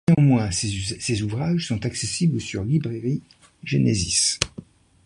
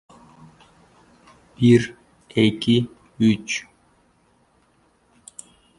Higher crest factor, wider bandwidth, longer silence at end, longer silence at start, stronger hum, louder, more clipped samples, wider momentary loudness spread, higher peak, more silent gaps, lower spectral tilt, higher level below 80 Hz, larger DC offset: about the same, 22 dB vs 20 dB; about the same, 11.5 kHz vs 11.5 kHz; second, 0.45 s vs 2.15 s; second, 0.1 s vs 1.6 s; neither; second, -23 LUFS vs -20 LUFS; neither; second, 9 LU vs 25 LU; first, 0 dBFS vs -4 dBFS; neither; second, -4.5 dB/octave vs -6 dB/octave; first, -44 dBFS vs -56 dBFS; neither